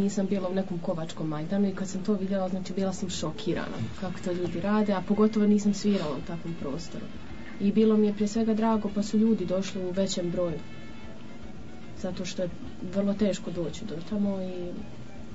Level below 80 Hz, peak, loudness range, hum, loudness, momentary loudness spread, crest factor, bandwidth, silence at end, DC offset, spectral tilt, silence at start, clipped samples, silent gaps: -52 dBFS; -12 dBFS; 6 LU; none; -29 LUFS; 18 LU; 16 dB; 8 kHz; 0 s; 1%; -6.5 dB/octave; 0 s; under 0.1%; none